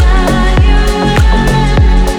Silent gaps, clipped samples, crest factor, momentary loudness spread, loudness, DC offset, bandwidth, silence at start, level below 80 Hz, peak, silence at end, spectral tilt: none; under 0.1%; 6 dB; 1 LU; -10 LUFS; under 0.1%; 12.5 kHz; 0 s; -10 dBFS; 0 dBFS; 0 s; -6 dB/octave